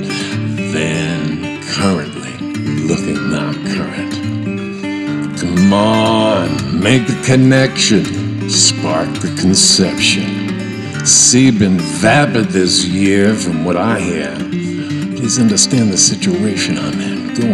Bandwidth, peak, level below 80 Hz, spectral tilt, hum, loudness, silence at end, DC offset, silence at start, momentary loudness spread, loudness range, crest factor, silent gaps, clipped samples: 13 kHz; 0 dBFS; -44 dBFS; -3.5 dB/octave; none; -13 LUFS; 0 s; under 0.1%; 0 s; 11 LU; 7 LU; 14 dB; none; under 0.1%